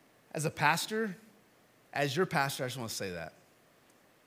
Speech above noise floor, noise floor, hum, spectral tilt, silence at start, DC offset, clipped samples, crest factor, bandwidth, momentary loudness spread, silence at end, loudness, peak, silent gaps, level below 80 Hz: 32 dB; -65 dBFS; none; -4 dB/octave; 0.35 s; under 0.1%; under 0.1%; 24 dB; 16.5 kHz; 15 LU; 0.95 s; -33 LUFS; -12 dBFS; none; -76 dBFS